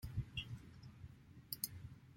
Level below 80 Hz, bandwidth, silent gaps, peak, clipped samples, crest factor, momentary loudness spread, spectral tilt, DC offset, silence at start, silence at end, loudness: -60 dBFS; 16.5 kHz; none; -22 dBFS; under 0.1%; 28 dB; 14 LU; -3 dB/octave; under 0.1%; 0 s; 0 s; -48 LUFS